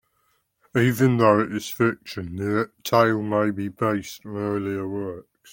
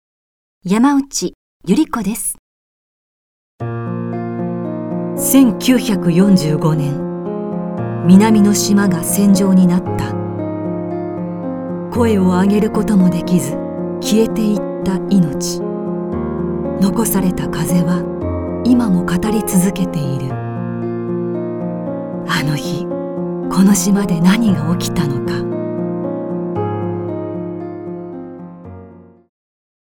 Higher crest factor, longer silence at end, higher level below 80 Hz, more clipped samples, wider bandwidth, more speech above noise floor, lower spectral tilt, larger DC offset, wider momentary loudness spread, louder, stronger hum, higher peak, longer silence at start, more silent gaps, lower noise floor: about the same, 20 dB vs 16 dB; second, 0.3 s vs 0.8 s; second, -60 dBFS vs -42 dBFS; neither; about the same, 17 kHz vs 18.5 kHz; first, 46 dB vs 26 dB; about the same, -6.5 dB/octave vs -6 dB/octave; neither; about the same, 13 LU vs 12 LU; second, -23 LUFS vs -16 LUFS; neither; second, -4 dBFS vs 0 dBFS; about the same, 0.75 s vs 0.65 s; second, none vs 1.35-1.60 s, 2.39-3.58 s; first, -69 dBFS vs -39 dBFS